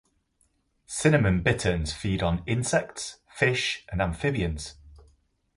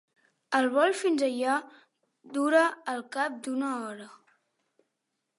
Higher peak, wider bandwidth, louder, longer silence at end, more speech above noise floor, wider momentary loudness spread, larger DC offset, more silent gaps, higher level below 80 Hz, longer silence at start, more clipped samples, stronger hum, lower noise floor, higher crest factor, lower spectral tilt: first, -6 dBFS vs -10 dBFS; about the same, 11.5 kHz vs 11.5 kHz; about the same, -26 LUFS vs -28 LUFS; second, 0.6 s vs 1.25 s; second, 44 dB vs 55 dB; about the same, 14 LU vs 12 LU; neither; neither; first, -42 dBFS vs -86 dBFS; first, 0.9 s vs 0.5 s; neither; neither; second, -70 dBFS vs -82 dBFS; about the same, 22 dB vs 20 dB; first, -5 dB/octave vs -3 dB/octave